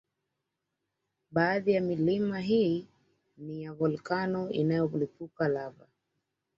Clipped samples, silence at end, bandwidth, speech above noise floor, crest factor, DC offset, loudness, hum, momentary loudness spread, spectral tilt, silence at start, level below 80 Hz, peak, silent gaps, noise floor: under 0.1%; 0.85 s; 7.6 kHz; 55 dB; 20 dB; under 0.1%; -30 LUFS; none; 12 LU; -8.5 dB/octave; 1.3 s; -70 dBFS; -12 dBFS; none; -85 dBFS